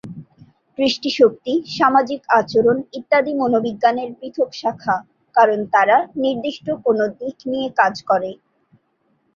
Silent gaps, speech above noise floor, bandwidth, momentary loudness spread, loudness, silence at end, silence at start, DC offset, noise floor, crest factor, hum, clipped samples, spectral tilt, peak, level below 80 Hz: none; 47 dB; 7.4 kHz; 9 LU; -18 LUFS; 1 s; 0.05 s; under 0.1%; -65 dBFS; 18 dB; none; under 0.1%; -5 dB/octave; -2 dBFS; -62 dBFS